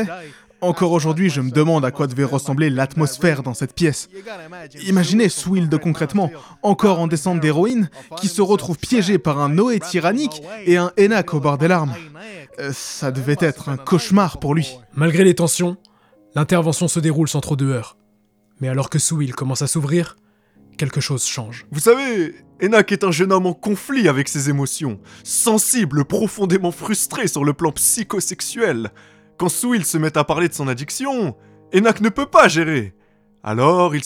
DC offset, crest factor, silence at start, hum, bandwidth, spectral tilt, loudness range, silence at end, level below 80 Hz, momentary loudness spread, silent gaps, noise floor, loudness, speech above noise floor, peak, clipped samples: under 0.1%; 18 dB; 0 s; none; 17 kHz; -5 dB/octave; 3 LU; 0 s; -52 dBFS; 11 LU; none; -59 dBFS; -18 LUFS; 41 dB; 0 dBFS; under 0.1%